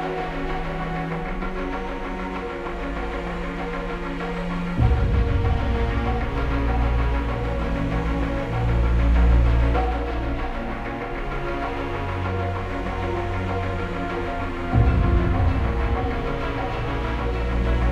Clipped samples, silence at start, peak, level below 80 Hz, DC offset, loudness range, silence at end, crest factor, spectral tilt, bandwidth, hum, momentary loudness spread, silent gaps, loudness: under 0.1%; 0 s; -6 dBFS; -26 dBFS; under 0.1%; 6 LU; 0 s; 16 dB; -8 dB/octave; 7.2 kHz; none; 9 LU; none; -25 LUFS